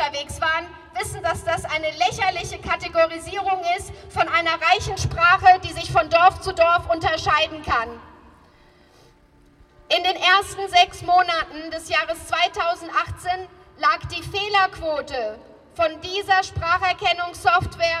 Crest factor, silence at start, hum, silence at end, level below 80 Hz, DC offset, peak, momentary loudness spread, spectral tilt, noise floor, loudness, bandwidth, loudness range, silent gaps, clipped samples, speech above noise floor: 20 dB; 0 s; none; 0 s; -46 dBFS; under 0.1%; -2 dBFS; 11 LU; -3 dB/octave; -54 dBFS; -21 LUFS; 13.5 kHz; 6 LU; none; under 0.1%; 33 dB